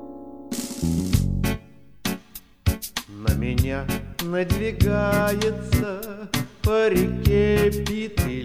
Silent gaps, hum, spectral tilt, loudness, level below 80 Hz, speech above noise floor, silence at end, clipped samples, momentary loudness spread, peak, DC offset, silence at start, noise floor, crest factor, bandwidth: none; none; -6 dB/octave; -24 LUFS; -32 dBFS; 23 dB; 0 s; under 0.1%; 11 LU; -4 dBFS; 0.4%; 0 s; -45 dBFS; 20 dB; 16 kHz